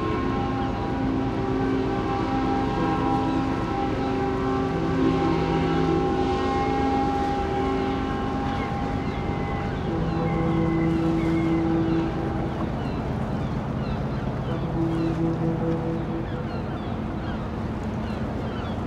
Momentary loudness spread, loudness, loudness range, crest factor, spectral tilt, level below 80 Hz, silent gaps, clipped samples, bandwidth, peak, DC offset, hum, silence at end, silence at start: 6 LU; -25 LUFS; 4 LU; 14 dB; -8 dB/octave; -36 dBFS; none; under 0.1%; 9.6 kHz; -10 dBFS; under 0.1%; none; 0 s; 0 s